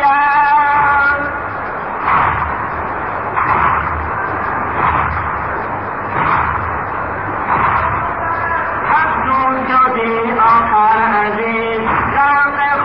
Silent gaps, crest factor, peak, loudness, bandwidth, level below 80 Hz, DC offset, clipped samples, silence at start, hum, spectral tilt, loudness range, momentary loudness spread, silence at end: none; 12 dB; -2 dBFS; -14 LUFS; 5.6 kHz; -34 dBFS; 0.5%; under 0.1%; 0 s; none; -9 dB/octave; 4 LU; 9 LU; 0 s